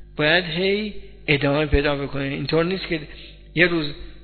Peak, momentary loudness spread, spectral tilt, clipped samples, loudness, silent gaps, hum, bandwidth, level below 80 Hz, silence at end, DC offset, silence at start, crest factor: -2 dBFS; 13 LU; -9 dB/octave; under 0.1%; -21 LUFS; none; none; 4.6 kHz; -34 dBFS; 0 s; under 0.1%; 0 s; 22 dB